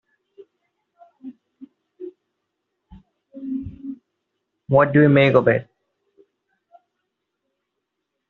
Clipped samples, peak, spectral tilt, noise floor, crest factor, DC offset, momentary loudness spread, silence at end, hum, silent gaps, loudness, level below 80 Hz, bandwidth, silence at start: under 0.1%; -2 dBFS; -6 dB/octave; -79 dBFS; 22 dB; under 0.1%; 28 LU; 2.65 s; none; none; -17 LUFS; -58 dBFS; 4.3 kHz; 1.25 s